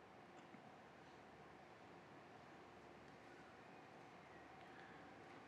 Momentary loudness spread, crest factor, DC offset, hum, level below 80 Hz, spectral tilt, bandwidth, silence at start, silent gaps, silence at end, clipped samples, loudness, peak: 2 LU; 16 dB; under 0.1%; none; -84 dBFS; -5 dB/octave; 10 kHz; 0 s; none; 0 s; under 0.1%; -62 LUFS; -46 dBFS